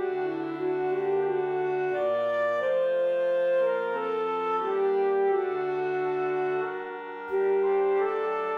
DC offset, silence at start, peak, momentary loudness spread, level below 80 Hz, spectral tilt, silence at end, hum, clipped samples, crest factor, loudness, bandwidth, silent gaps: under 0.1%; 0 s; -16 dBFS; 6 LU; -74 dBFS; -7 dB/octave; 0 s; none; under 0.1%; 10 dB; -27 LUFS; 5 kHz; none